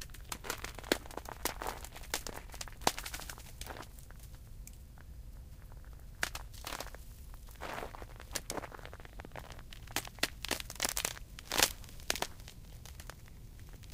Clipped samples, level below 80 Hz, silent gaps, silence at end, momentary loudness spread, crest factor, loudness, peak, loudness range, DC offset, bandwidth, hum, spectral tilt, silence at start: under 0.1%; -50 dBFS; none; 0 s; 18 LU; 38 dB; -39 LUFS; -4 dBFS; 10 LU; under 0.1%; 16 kHz; none; -2 dB/octave; 0 s